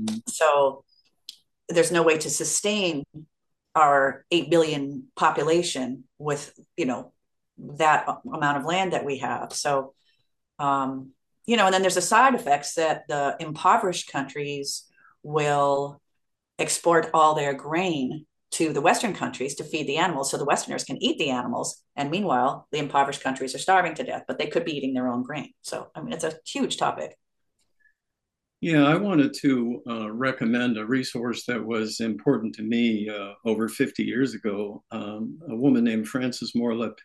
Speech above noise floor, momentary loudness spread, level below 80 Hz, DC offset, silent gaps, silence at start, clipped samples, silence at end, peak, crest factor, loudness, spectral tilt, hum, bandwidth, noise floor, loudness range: 59 dB; 13 LU; -70 dBFS; under 0.1%; none; 0 s; under 0.1%; 0.1 s; -6 dBFS; 20 dB; -25 LUFS; -4 dB/octave; none; 12.5 kHz; -84 dBFS; 4 LU